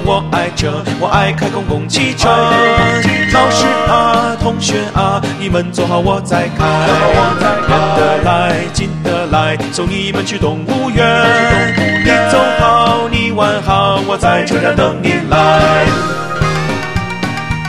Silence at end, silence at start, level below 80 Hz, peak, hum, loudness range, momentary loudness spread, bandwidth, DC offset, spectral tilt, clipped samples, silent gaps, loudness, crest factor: 0 s; 0 s; -28 dBFS; 0 dBFS; none; 2 LU; 7 LU; 14 kHz; 0.7%; -5 dB/octave; under 0.1%; none; -12 LUFS; 12 dB